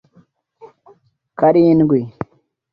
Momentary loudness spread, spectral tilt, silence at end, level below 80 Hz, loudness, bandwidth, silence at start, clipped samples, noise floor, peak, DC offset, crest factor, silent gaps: 20 LU; -11.5 dB/octave; 0.65 s; -54 dBFS; -14 LUFS; 5.2 kHz; 0.65 s; under 0.1%; -54 dBFS; -2 dBFS; under 0.1%; 16 dB; none